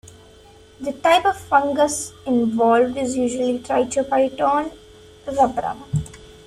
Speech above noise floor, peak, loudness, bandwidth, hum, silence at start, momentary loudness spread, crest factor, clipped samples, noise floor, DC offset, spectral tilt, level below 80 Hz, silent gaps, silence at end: 28 dB; -2 dBFS; -20 LUFS; 14.5 kHz; none; 0.05 s; 11 LU; 18 dB; under 0.1%; -47 dBFS; under 0.1%; -4.5 dB/octave; -50 dBFS; none; 0.3 s